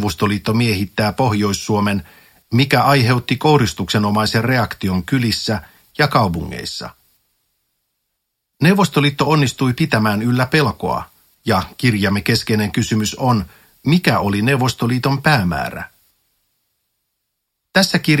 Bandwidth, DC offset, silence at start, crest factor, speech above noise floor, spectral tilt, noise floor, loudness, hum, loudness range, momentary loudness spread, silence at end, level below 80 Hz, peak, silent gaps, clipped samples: 16.5 kHz; under 0.1%; 0 s; 18 dB; 59 dB; -5.5 dB/octave; -75 dBFS; -17 LUFS; none; 4 LU; 10 LU; 0 s; -44 dBFS; 0 dBFS; none; under 0.1%